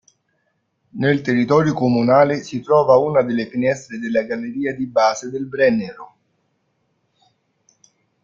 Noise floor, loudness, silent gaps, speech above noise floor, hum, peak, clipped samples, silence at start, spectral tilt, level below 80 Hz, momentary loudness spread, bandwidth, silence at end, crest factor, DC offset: -69 dBFS; -18 LUFS; none; 51 dB; none; -2 dBFS; under 0.1%; 0.95 s; -6.5 dB/octave; -60 dBFS; 11 LU; 7.4 kHz; 2.2 s; 18 dB; under 0.1%